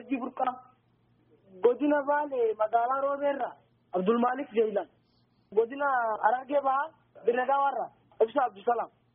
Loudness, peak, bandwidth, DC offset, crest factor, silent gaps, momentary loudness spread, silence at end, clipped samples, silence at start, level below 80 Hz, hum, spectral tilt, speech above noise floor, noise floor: -29 LUFS; -10 dBFS; 3.7 kHz; under 0.1%; 18 dB; none; 9 LU; 0.3 s; under 0.1%; 0 s; -78 dBFS; none; -4 dB/octave; 40 dB; -68 dBFS